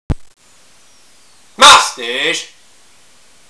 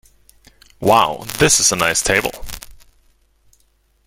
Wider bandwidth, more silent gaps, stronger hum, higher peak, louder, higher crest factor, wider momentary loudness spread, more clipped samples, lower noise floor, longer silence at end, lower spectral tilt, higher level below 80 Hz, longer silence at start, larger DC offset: second, 11 kHz vs 17 kHz; neither; neither; about the same, 0 dBFS vs 0 dBFS; first, -9 LUFS vs -15 LUFS; about the same, 16 dB vs 20 dB; about the same, 20 LU vs 21 LU; first, 0.6% vs under 0.1%; second, -49 dBFS vs -59 dBFS; second, 1.05 s vs 1.35 s; about the same, -1 dB/octave vs -2 dB/octave; about the same, -36 dBFS vs -40 dBFS; second, 0.1 s vs 0.8 s; neither